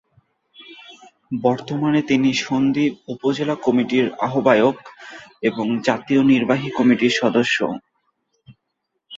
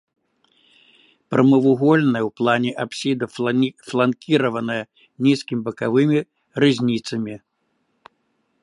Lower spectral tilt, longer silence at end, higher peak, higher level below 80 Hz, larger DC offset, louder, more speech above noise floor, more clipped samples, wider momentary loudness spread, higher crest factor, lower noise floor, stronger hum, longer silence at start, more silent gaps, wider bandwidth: about the same, -5.5 dB/octave vs -6.5 dB/octave; second, 0 s vs 1.25 s; about the same, 0 dBFS vs -2 dBFS; first, -60 dBFS vs -66 dBFS; neither; about the same, -19 LUFS vs -20 LUFS; first, 57 dB vs 51 dB; neither; first, 15 LU vs 11 LU; about the same, 20 dB vs 20 dB; first, -76 dBFS vs -70 dBFS; neither; second, 0.6 s vs 1.3 s; neither; second, 7.8 kHz vs 11 kHz